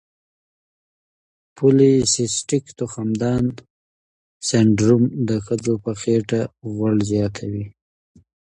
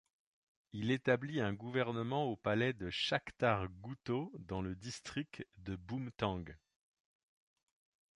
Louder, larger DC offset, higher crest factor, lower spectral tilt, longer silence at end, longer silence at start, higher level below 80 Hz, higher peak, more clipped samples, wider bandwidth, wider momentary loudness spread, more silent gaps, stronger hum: first, -20 LUFS vs -38 LUFS; neither; about the same, 18 dB vs 22 dB; about the same, -5.5 dB/octave vs -6 dB/octave; second, 0.8 s vs 1.6 s; first, 1.55 s vs 0.75 s; first, -50 dBFS vs -62 dBFS; first, -2 dBFS vs -16 dBFS; neither; about the same, 11 kHz vs 11 kHz; about the same, 13 LU vs 12 LU; first, 3.70-4.40 s vs none; neither